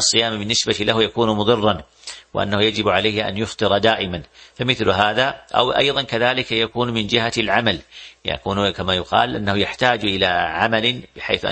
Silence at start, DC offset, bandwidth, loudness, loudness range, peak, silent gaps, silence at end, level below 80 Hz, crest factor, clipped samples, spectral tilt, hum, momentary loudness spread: 0 s; under 0.1%; 8.8 kHz; -19 LUFS; 2 LU; 0 dBFS; none; 0 s; -46 dBFS; 20 dB; under 0.1%; -3.5 dB/octave; none; 8 LU